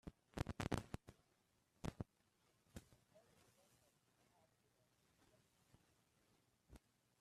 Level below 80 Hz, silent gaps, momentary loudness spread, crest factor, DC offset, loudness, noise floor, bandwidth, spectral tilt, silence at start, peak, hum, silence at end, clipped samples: -66 dBFS; none; 23 LU; 32 dB; under 0.1%; -51 LUFS; -82 dBFS; 13.5 kHz; -5.5 dB/octave; 0.05 s; -24 dBFS; none; 0.45 s; under 0.1%